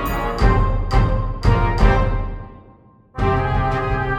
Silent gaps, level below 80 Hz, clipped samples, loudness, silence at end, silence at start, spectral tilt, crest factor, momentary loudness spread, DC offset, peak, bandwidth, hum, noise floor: none; -22 dBFS; under 0.1%; -19 LUFS; 0 s; 0 s; -7.5 dB/octave; 16 dB; 12 LU; under 0.1%; -2 dBFS; 17 kHz; none; -48 dBFS